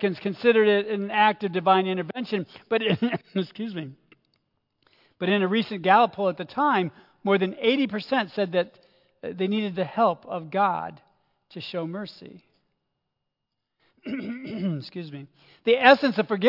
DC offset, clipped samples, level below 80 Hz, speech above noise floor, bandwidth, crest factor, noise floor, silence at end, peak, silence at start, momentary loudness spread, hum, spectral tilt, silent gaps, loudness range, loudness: under 0.1%; under 0.1%; -76 dBFS; 58 dB; 5.8 kHz; 24 dB; -82 dBFS; 0 s; -2 dBFS; 0 s; 17 LU; none; -7.5 dB/octave; none; 13 LU; -24 LUFS